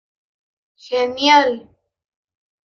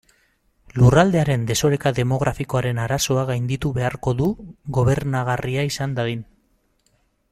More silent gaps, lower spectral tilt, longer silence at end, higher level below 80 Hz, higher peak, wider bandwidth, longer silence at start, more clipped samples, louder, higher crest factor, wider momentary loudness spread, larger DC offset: neither; second, -2 dB/octave vs -6 dB/octave; about the same, 1.05 s vs 1.1 s; second, -66 dBFS vs -42 dBFS; about the same, -2 dBFS vs -2 dBFS; second, 7.4 kHz vs 14.5 kHz; first, 0.9 s vs 0.75 s; neither; first, -16 LUFS vs -21 LUFS; about the same, 20 dB vs 18 dB; first, 12 LU vs 9 LU; neither